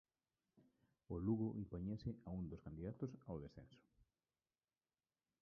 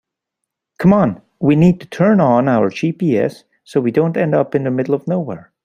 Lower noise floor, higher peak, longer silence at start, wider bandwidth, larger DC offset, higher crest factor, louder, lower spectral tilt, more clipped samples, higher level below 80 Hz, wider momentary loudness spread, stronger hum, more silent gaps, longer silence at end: first, under -90 dBFS vs -79 dBFS; second, -30 dBFS vs -2 dBFS; second, 0.55 s vs 0.8 s; second, 6.2 kHz vs 9.8 kHz; neither; first, 20 dB vs 14 dB; second, -48 LUFS vs -16 LUFS; about the same, -10 dB/octave vs -9 dB/octave; neither; second, -66 dBFS vs -52 dBFS; first, 11 LU vs 8 LU; neither; neither; first, 1.65 s vs 0.25 s